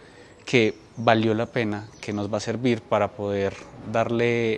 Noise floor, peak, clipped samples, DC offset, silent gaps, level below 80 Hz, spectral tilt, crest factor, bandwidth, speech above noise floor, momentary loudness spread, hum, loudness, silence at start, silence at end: -43 dBFS; -2 dBFS; under 0.1%; under 0.1%; none; -58 dBFS; -6 dB/octave; 22 dB; 10 kHz; 20 dB; 9 LU; none; -24 LUFS; 0 s; 0 s